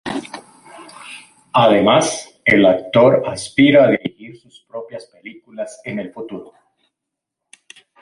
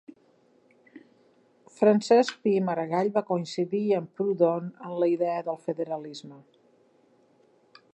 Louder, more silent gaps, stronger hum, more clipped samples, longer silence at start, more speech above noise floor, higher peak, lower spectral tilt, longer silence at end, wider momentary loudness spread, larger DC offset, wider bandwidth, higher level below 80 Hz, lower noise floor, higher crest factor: first, -15 LUFS vs -26 LUFS; neither; neither; neither; about the same, 0.05 s vs 0.1 s; first, 66 dB vs 37 dB; first, -2 dBFS vs -10 dBFS; second, -5 dB/octave vs -6.5 dB/octave; about the same, 1.6 s vs 1.55 s; first, 23 LU vs 11 LU; neither; first, 11.5 kHz vs 9 kHz; first, -56 dBFS vs -84 dBFS; first, -82 dBFS vs -63 dBFS; about the same, 16 dB vs 18 dB